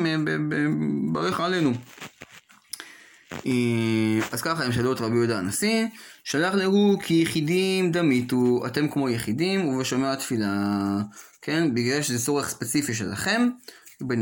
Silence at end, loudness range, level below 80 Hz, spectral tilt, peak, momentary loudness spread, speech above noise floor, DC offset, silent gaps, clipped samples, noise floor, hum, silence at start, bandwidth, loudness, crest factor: 0 s; 4 LU; -60 dBFS; -5 dB/octave; -8 dBFS; 13 LU; 25 dB; under 0.1%; none; under 0.1%; -49 dBFS; none; 0 s; 17 kHz; -24 LUFS; 16 dB